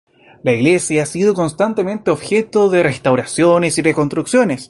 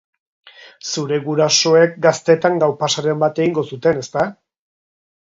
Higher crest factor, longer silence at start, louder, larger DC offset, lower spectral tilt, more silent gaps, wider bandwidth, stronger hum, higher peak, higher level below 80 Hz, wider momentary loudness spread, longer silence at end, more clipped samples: about the same, 14 dB vs 18 dB; second, 0.45 s vs 0.65 s; about the same, -15 LUFS vs -16 LUFS; neither; about the same, -5 dB/octave vs -4 dB/octave; neither; first, 11.5 kHz vs 7.8 kHz; neither; about the same, 0 dBFS vs 0 dBFS; first, -52 dBFS vs -62 dBFS; second, 5 LU vs 10 LU; second, 0.05 s vs 1.05 s; neither